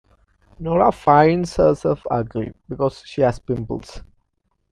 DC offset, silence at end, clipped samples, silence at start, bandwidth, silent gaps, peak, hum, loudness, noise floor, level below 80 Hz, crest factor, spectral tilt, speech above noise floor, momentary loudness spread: under 0.1%; 0.7 s; under 0.1%; 0.6 s; 11 kHz; none; 0 dBFS; none; -19 LUFS; -70 dBFS; -42 dBFS; 20 dB; -7.5 dB/octave; 51 dB; 15 LU